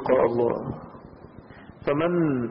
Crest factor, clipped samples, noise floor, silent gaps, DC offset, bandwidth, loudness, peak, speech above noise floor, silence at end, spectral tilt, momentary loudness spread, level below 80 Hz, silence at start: 18 dB; under 0.1%; -46 dBFS; none; under 0.1%; 5.6 kHz; -25 LUFS; -8 dBFS; 23 dB; 0 s; -12 dB/octave; 24 LU; -54 dBFS; 0 s